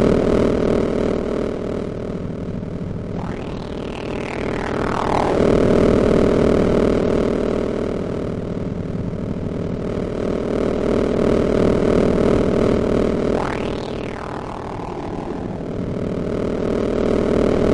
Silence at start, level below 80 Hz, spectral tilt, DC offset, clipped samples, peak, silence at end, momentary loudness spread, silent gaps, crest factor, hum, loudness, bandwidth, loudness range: 0 s; -34 dBFS; -7.5 dB/octave; under 0.1%; under 0.1%; -2 dBFS; 0 s; 11 LU; none; 16 dB; none; -20 LUFS; 11 kHz; 8 LU